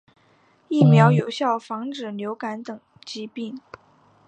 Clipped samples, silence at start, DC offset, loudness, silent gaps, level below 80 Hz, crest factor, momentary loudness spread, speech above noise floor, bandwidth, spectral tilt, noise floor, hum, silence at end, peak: under 0.1%; 0.7 s; under 0.1%; -21 LUFS; none; -68 dBFS; 20 dB; 21 LU; 38 dB; 8.6 kHz; -7.5 dB/octave; -59 dBFS; none; 0.7 s; -2 dBFS